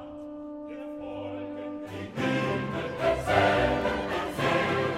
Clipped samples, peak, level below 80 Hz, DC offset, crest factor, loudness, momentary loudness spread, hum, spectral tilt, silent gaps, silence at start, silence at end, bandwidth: under 0.1%; -8 dBFS; -48 dBFS; under 0.1%; 20 dB; -28 LUFS; 16 LU; none; -6 dB/octave; none; 0 s; 0 s; 16 kHz